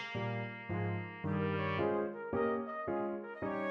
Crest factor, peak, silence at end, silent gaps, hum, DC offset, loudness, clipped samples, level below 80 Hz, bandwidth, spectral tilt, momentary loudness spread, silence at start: 14 dB; -22 dBFS; 0 s; none; none; under 0.1%; -37 LUFS; under 0.1%; -66 dBFS; 6.6 kHz; -8.5 dB/octave; 6 LU; 0 s